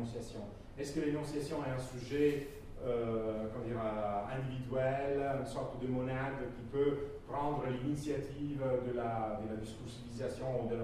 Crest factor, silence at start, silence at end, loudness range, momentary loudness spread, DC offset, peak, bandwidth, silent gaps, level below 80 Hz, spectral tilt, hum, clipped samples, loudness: 18 dB; 0 s; 0 s; 1 LU; 9 LU; under 0.1%; -20 dBFS; 15 kHz; none; -54 dBFS; -7 dB/octave; none; under 0.1%; -38 LUFS